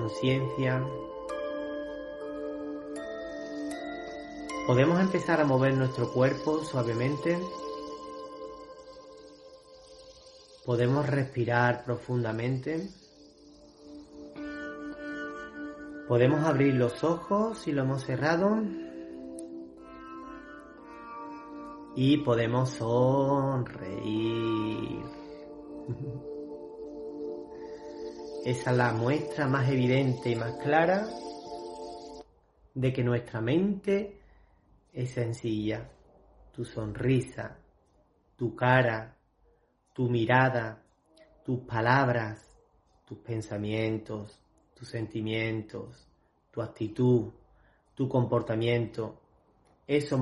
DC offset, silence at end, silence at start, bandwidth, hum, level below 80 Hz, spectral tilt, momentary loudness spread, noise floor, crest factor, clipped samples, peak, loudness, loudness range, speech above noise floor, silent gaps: under 0.1%; 0 s; 0 s; 11.5 kHz; none; -60 dBFS; -7 dB/octave; 19 LU; -67 dBFS; 24 dB; under 0.1%; -8 dBFS; -30 LUFS; 9 LU; 40 dB; none